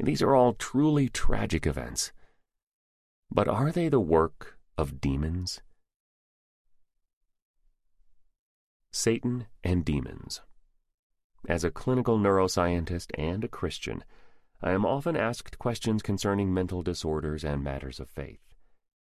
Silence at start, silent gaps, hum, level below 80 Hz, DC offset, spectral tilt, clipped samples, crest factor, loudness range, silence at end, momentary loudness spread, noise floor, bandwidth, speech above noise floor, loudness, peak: 0 s; 2.63-3.23 s, 5.96-6.65 s, 7.13-7.21 s, 7.42-7.54 s, 8.39-8.80 s, 10.94-11.10 s, 11.24-11.30 s; none; -42 dBFS; under 0.1%; -5.5 dB/octave; under 0.1%; 20 dB; 7 LU; 0.8 s; 14 LU; -65 dBFS; 14 kHz; 38 dB; -29 LUFS; -8 dBFS